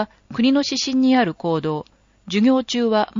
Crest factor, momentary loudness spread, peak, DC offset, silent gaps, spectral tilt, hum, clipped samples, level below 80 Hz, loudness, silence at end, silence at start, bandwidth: 14 dB; 9 LU; -6 dBFS; under 0.1%; none; -4 dB/octave; none; under 0.1%; -58 dBFS; -19 LUFS; 0 s; 0 s; 7.4 kHz